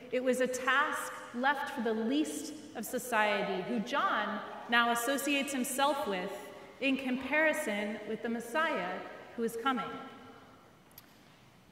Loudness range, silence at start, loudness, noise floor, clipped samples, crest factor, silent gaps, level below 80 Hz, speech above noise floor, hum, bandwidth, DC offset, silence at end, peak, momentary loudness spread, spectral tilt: 5 LU; 0 s; -32 LUFS; -60 dBFS; under 0.1%; 22 dB; none; -74 dBFS; 27 dB; none; 16 kHz; under 0.1%; 0.7 s; -12 dBFS; 13 LU; -3 dB/octave